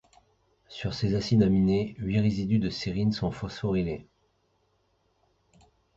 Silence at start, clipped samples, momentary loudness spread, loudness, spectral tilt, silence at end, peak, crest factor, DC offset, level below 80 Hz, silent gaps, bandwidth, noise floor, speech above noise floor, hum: 0.7 s; under 0.1%; 11 LU; -27 LUFS; -7.5 dB/octave; 1.95 s; -10 dBFS; 18 dB; under 0.1%; -48 dBFS; none; 7.8 kHz; -71 dBFS; 45 dB; none